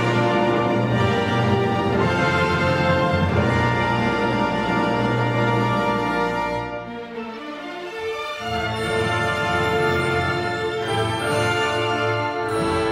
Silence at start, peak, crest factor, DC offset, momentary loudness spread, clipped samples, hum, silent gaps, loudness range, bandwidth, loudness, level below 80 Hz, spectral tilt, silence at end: 0 s; -6 dBFS; 16 dB; under 0.1%; 9 LU; under 0.1%; none; none; 5 LU; 16 kHz; -21 LUFS; -44 dBFS; -6 dB/octave; 0 s